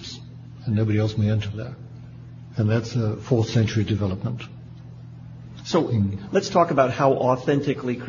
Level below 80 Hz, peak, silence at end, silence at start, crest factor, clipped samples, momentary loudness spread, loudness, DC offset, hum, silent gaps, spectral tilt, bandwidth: -52 dBFS; -4 dBFS; 0 s; 0 s; 20 dB; under 0.1%; 21 LU; -23 LUFS; under 0.1%; none; none; -7 dB/octave; 7.4 kHz